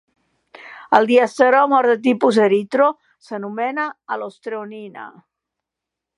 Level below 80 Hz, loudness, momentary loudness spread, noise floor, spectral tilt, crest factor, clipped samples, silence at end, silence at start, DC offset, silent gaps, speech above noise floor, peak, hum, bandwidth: -72 dBFS; -17 LUFS; 22 LU; -84 dBFS; -5.5 dB/octave; 18 dB; under 0.1%; 1.1 s; 0.65 s; under 0.1%; none; 67 dB; 0 dBFS; none; 11 kHz